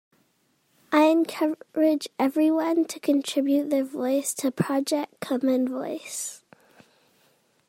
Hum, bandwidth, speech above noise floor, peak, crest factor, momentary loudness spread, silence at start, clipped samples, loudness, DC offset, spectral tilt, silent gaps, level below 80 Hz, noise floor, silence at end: none; 16.5 kHz; 44 dB; -8 dBFS; 18 dB; 9 LU; 0.9 s; under 0.1%; -25 LUFS; under 0.1%; -4.5 dB/octave; none; -76 dBFS; -68 dBFS; 1.3 s